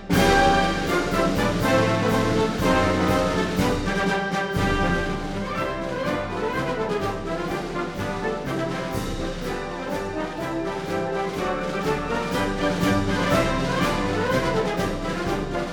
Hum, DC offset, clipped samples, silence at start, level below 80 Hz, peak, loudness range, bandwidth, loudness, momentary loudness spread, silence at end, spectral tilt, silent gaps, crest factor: none; under 0.1%; under 0.1%; 0 s; -36 dBFS; -6 dBFS; 6 LU; over 20 kHz; -24 LUFS; 8 LU; 0 s; -5.5 dB/octave; none; 18 dB